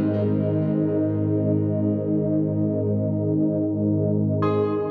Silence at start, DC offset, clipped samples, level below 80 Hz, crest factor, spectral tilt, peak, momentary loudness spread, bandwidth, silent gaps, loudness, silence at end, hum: 0 s; under 0.1%; under 0.1%; -62 dBFS; 12 dB; -12.5 dB/octave; -10 dBFS; 1 LU; 4.5 kHz; none; -23 LUFS; 0 s; none